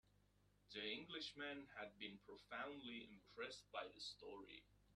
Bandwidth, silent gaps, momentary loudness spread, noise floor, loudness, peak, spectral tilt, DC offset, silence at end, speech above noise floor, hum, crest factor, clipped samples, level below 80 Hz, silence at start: 12.5 kHz; none; 10 LU; -78 dBFS; -53 LUFS; -36 dBFS; -3 dB/octave; under 0.1%; 0 s; 24 dB; 50 Hz at -75 dBFS; 18 dB; under 0.1%; -80 dBFS; 0.05 s